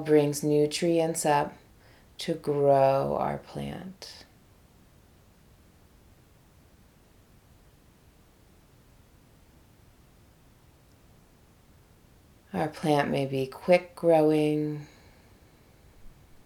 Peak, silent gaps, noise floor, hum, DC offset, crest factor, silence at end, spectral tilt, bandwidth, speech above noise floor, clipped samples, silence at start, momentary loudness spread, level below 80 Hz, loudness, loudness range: -6 dBFS; none; -58 dBFS; none; under 0.1%; 24 dB; 0.35 s; -5.5 dB/octave; 19 kHz; 33 dB; under 0.1%; 0 s; 18 LU; -60 dBFS; -26 LUFS; 15 LU